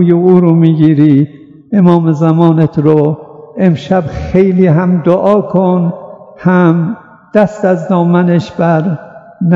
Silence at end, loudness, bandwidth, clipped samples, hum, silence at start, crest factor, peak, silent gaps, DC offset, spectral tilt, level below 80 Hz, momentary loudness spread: 0 s; -10 LUFS; 7.2 kHz; 1%; none; 0 s; 10 dB; 0 dBFS; none; under 0.1%; -9.5 dB/octave; -40 dBFS; 10 LU